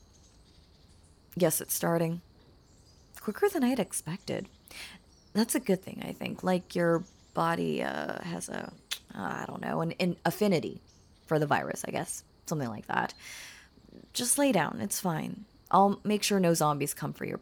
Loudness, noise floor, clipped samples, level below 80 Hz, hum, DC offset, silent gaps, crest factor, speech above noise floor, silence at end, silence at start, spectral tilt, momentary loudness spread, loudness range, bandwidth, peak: -30 LUFS; -59 dBFS; under 0.1%; -64 dBFS; none; under 0.1%; none; 20 dB; 29 dB; 0 s; 1.35 s; -4.5 dB/octave; 15 LU; 5 LU; over 20 kHz; -12 dBFS